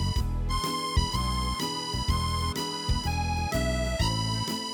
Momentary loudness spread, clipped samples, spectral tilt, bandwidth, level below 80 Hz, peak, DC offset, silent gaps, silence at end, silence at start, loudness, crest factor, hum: 3 LU; under 0.1%; -4.5 dB/octave; over 20 kHz; -32 dBFS; -12 dBFS; under 0.1%; none; 0 s; 0 s; -29 LUFS; 16 dB; none